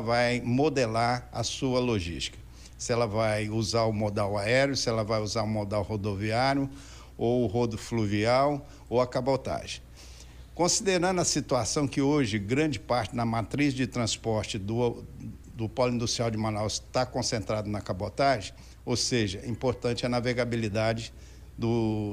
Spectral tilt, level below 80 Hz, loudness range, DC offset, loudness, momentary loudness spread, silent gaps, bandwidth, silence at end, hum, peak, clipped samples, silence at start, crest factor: -4.5 dB/octave; -50 dBFS; 3 LU; under 0.1%; -28 LUFS; 11 LU; none; 15.5 kHz; 0 s; none; -12 dBFS; under 0.1%; 0 s; 16 dB